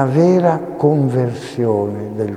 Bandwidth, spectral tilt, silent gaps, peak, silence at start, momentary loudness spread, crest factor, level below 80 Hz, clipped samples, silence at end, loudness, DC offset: 11 kHz; -8.5 dB/octave; none; 0 dBFS; 0 s; 9 LU; 16 dB; -58 dBFS; under 0.1%; 0 s; -16 LUFS; under 0.1%